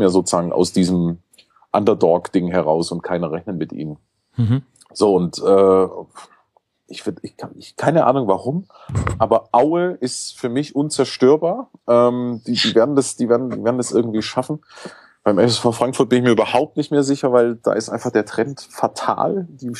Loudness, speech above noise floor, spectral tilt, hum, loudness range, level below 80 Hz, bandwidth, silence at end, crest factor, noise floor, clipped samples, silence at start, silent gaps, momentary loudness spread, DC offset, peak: -18 LUFS; 44 dB; -5.5 dB/octave; none; 3 LU; -48 dBFS; 12.5 kHz; 0 s; 18 dB; -62 dBFS; under 0.1%; 0 s; none; 13 LU; under 0.1%; -2 dBFS